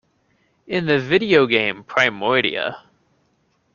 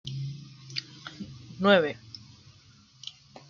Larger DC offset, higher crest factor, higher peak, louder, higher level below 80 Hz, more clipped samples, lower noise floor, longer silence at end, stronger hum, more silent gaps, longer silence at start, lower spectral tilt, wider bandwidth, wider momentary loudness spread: neither; about the same, 20 dB vs 24 dB; first, 0 dBFS vs -6 dBFS; first, -18 LUFS vs -27 LUFS; first, -60 dBFS vs -66 dBFS; neither; first, -65 dBFS vs -57 dBFS; first, 0.95 s vs 0.1 s; neither; neither; first, 0.7 s vs 0.05 s; about the same, -5.5 dB/octave vs -5.5 dB/octave; about the same, 7.2 kHz vs 7.6 kHz; second, 10 LU vs 22 LU